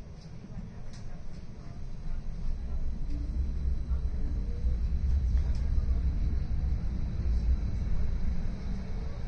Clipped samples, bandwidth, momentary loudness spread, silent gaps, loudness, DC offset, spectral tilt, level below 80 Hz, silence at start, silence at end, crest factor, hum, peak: under 0.1%; 6.6 kHz; 15 LU; none; -34 LUFS; under 0.1%; -8.5 dB/octave; -30 dBFS; 0 s; 0 s; 14 dB; none; -16 dBFS